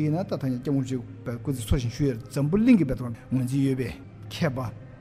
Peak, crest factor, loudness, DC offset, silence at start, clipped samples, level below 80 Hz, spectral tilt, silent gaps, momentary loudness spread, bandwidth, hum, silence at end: -8 dBFS; 18 dB; -26 LUFS; under 0.1%; 0 s; under 0.1%; -42 dBFS; -7.5 dB/octave; none; 13 LU; 15.5 kHz; none; 0 s